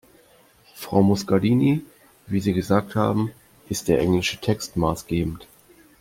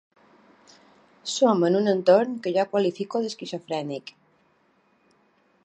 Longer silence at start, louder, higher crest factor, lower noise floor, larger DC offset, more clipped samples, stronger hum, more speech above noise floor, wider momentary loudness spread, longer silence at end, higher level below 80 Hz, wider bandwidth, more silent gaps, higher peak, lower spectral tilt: second, 0.75 s vs 1.25 s; about the same, -23 LUFS vs -24 LUFS; about the same, 20 dB vs 20 dB; second, -55 dBFS vs -65 dBFS; neither; neither; neither; second, 34 dB vs 42 dB; second, 10 LU vs 15 LU; second, 0.6 s vs 1.55 s; first, -48 dBFS vs -80 dBFS; first, 16.5 kHz vs 9.4 kHz; neither; about the same, -4 dBFS vs -6 dBFS; about the same, -6 dB/octave vs -5.5 dB/octave